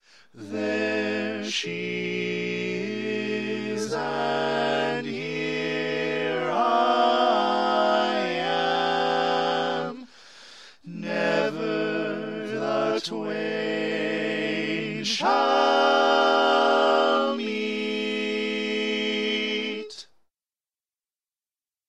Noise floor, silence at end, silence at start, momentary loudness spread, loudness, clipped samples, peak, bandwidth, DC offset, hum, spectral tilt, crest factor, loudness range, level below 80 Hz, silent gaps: under -90 dBFS; 1.85 s; 0.35 s; 10 LU; -25 LUFS; under 0.1%; -8 dBFS; 11.5 kHz; 0.1%; none; -4 dB/octave; 18 dB; 7 LU; -78 dBFS; none